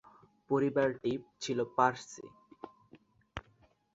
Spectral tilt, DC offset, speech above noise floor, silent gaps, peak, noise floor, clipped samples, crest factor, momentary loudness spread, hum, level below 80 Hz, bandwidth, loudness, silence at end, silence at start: -5.5 dB/octave; under 0.1%; 35 dB; none; -12 dBFS; -68 dBFS; under 0.1%; 24 dB; 23 LU; none; -66 dBFS; 7.8 kHz; -32 LUFS; 0.55 s; 0.5 s